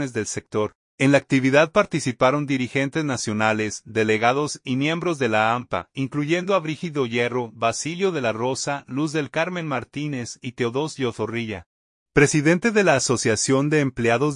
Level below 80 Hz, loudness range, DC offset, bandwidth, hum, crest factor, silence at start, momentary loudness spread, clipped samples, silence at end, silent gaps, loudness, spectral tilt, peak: -56 dBFS; 5 LU; under 0.1%; 11 kHz; none; 20 dB; 0 s; 9 LU; under 0.1%; 0 s; 0.75-0.98 s, 11.66-12.06 s; -22 LUFS; -5 dB/octave; -2 dBFS